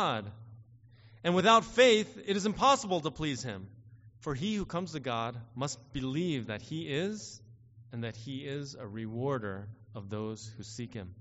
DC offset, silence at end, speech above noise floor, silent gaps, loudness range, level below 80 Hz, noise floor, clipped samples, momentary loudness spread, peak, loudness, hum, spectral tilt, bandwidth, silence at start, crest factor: under 0.1%; 0 s; 26 dB; none; 11 LU; -60 dBFS; -58 dBFS; under 0.1%; 20 LU; -10 dBFS; -32 LUFS; none; -3.5 dB/octave; 8 kHz; 0 s; 22 dB